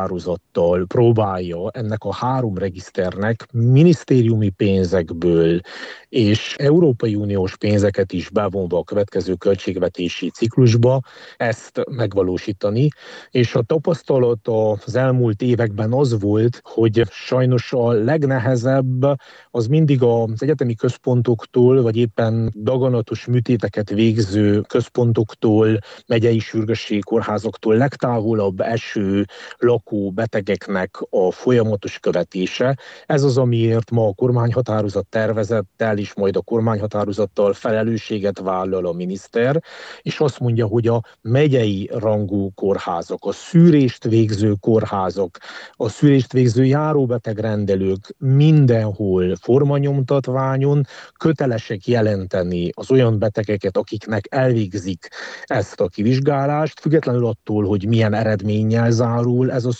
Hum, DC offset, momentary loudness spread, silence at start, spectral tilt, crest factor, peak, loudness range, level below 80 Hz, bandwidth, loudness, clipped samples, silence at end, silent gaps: none; under 0.1%; 8 LU; 0 s; -8 dB/octave; 16 dB; -2 dBFS; 3 LU; -54 dBFS; 8.2 kHz; -18 LUFS; under 0.1%; 0 s; none